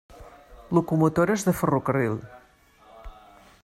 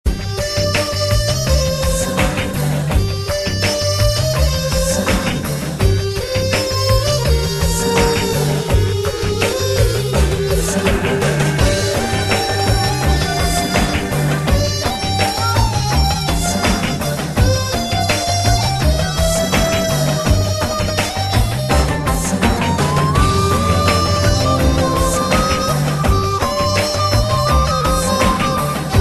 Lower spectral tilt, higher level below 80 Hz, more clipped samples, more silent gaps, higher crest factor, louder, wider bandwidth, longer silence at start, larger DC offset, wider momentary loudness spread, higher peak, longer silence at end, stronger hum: first, -7 dB/octave vs -4.5 dB/octave; second, -52 dBFS vs -22 dBFS; neither; neither; about the same, 18 dB vs 14 dB; second, -24 LUFS vs -16 LUFS; first, 16 kHz vs 13 kHz; first, 0.2 s vs 0.05 s; second, under 0.1% vs 0.4%; about the same, 5 LU vs 3 LU; second, -8 dBFS vs 0 dBFS; first, 0.55 s vs 0 s; neither